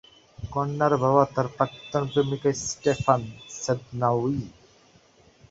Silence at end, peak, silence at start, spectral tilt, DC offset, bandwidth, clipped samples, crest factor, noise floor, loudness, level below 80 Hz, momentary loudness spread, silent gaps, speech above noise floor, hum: 1 s; -4 dBFS; 0.4 s; -5.5 dB/octave; under 0.1%; 8 kHz; under 0.1%; 22 dB; -57 dBFS; -25 LUFS; -54 dBFS; 11 LU; none; 33 dB; none